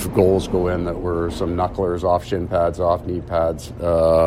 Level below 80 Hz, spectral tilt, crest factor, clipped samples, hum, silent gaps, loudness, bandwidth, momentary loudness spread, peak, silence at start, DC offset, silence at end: -36 dBFS; -7 dB/octave; 18 dB; under 0.1%; none; none; -21 LUFS; 16 kHz; 6 LU; -2 dBFS; 0 s; under 0.1%; 0 s